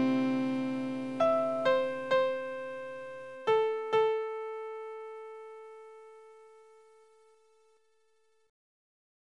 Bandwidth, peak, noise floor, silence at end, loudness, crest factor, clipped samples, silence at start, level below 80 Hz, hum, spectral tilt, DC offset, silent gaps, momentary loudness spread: 10.5 kHz; -16 dBFS; -73 dBFS; 2.65 s; -31 LUFS; 18 dB; under 0.1%; 0 s; -76 dBFS; none; -6 dB/octave; under 0.1%; none; 19 LU